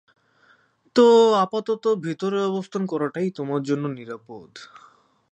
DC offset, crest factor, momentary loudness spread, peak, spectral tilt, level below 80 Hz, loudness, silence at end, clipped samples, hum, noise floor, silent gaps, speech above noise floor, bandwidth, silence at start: under 0.1%; 18 dB; 23 LU; -6 dBFS; -6 dB/octave; -76 dBFS; -21 LUFS; 0.65 s; under 0.1%; none; -60 dBFS; none; 38 dB; 8.4 kHz; 0.95 s